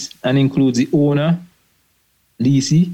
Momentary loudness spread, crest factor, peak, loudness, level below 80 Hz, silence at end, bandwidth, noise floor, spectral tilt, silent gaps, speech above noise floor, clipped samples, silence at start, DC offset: 5 LU; 12 dB; -4 dBFS; -16 LUFS; -56 dBFS; 0 s; 9 kHz; -61 dBFS; -6.5 dB/octave; none; 47 dB; under 0.1%; 0 s; under 0.1%